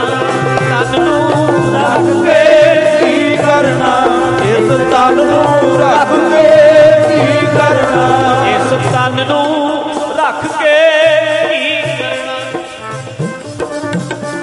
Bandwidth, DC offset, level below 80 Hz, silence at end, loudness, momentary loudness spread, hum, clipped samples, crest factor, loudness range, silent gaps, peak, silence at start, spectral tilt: 11.5 kHz; under 0.1%; -44 dBFS; 0 s; -10 LUFS; 12 LU; none; under 0.1%; 10 dB; 4 LU; none; 0 dBFS; 0 s; -5.5 dB/octave